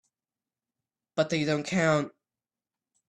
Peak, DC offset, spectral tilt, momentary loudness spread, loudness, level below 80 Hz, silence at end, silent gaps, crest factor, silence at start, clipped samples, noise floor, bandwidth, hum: -12 dBFS; under 0.1%; -5.5 dB/octave; 10 LU; -28 LUFS; -68 dBFS; 1 s; none; 20 dB; 1.15 s; under 0.1%; under -90 dBFS; 11 kHz; none